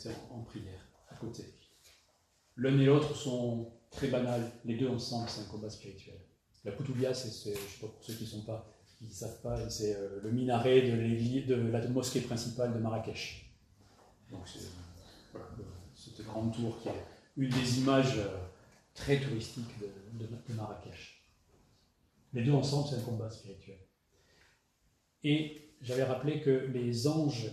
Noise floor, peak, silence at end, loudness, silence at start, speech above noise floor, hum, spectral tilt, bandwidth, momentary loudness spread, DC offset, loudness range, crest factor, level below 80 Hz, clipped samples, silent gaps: -74 dBFS; -12 dBFS; 0 s; -34 LUFS; 0 s; 40 dB; none; -6 dB/octave; 14 kHz; 21 LU; under 0.1%; 9 LU; 24 dB; -62 dBFS; under 0.1%; none